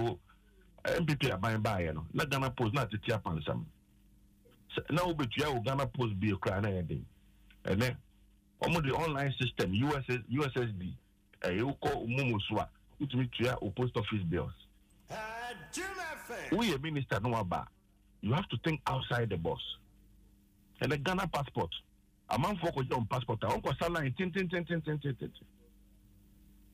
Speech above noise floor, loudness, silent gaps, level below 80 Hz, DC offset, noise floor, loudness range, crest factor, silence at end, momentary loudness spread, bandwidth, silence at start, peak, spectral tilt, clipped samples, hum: 31 dB; -35 LUFS; none; -56 dBFS; under 0.1%; -64 dBFS; 3 LU; 14 dB; 1.3 s; 10 LU; 15.5 kHz; 0 s; -20 dBFS; -6 dB/octave; under 0.1%; none